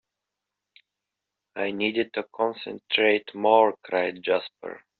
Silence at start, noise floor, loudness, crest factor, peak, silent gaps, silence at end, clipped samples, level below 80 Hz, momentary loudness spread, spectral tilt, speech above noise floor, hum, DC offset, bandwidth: 1.55 s; -86 dBFS; -24 LUFS; 22 dB; -4 dBFS; none; 0.2 s; under 0.1%; -74 dBFS; 15 LU; -1 dB/octave; 61 dB; none; under 0.1%; 4.7 kHz